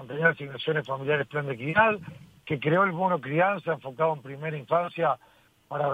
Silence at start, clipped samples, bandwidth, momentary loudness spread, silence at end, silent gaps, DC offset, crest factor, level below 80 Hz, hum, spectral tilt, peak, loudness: 0 s; under 0.1%; 9.4 kHz; 11 LU; 0 s; none; under 0.1%; 20 dB; -66 dBFS; none; -7.5 dB/octave; -6 dBFS; -27 LUFS